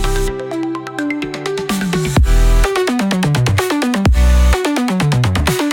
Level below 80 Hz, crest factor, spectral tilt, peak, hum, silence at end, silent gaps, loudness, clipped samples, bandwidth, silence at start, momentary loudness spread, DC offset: -18 dBFS; 12 dB; -5.5 dB/octave; -2 dBFS; none; 0 s; none; -16 LUFS; under 0.1%; 17.5 kHz; 0 s; 8 LU; under 0.1%